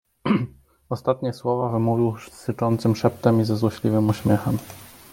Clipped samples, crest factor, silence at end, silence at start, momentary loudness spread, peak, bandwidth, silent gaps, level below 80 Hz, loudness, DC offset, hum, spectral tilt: under 0.1%; 20 dB; 0.25 s; 0.25 s; 12 LU; -4 dBFS; 17 kHz; none; -54 dBFS; -23 LUFS; under 0.1%; none; -8 dB/octave